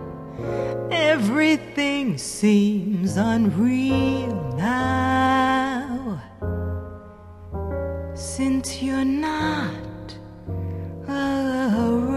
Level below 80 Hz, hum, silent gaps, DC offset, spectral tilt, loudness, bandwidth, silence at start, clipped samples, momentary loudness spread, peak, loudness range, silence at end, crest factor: -40 dBFS; none; none; under 0.1%; -5.5 dB/octave; -23 LUFS; 13 kHz; 0 s; under 0.1%; 14 LU; -8 dBFS; 6 LU; 0 s; 14 dB